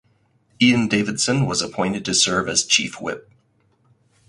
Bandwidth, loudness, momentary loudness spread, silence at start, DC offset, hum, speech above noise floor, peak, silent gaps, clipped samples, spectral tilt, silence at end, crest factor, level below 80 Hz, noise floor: 11.5 kHz; -19 LUFS; 11 LU; 0.6 s; under 0.1%; none; 42 dB; -4 dBFS; none; under 0.1%; -3 dB/octave; 1.1 s; 18 dB; -54 dBFS; -62 dBFS